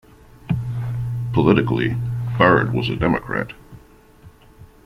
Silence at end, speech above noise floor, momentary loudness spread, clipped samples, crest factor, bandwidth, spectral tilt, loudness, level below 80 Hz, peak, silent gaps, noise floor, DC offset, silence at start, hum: 0.2 s; 30 dB; 11 LU; under 0.1%; 20 dB; 6 kHz; -8.5 dB/octave; -20 LUFS; -42 dBFS; -2 dBFS; none; -47 dBFS; under 0.1%; 0.45 s; none